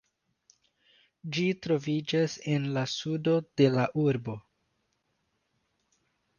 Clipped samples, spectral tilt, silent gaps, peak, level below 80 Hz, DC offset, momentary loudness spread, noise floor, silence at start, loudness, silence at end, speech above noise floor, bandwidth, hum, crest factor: under 0.1%; -6.5 dB/octave; none; -10 dBFS; -70 dBFS; under 0.1%; 10 LU; -77 dBFS; 1.25 s; -29 LUFS; 2 s; 49 dB; 7.2 kHz; none; 22 dB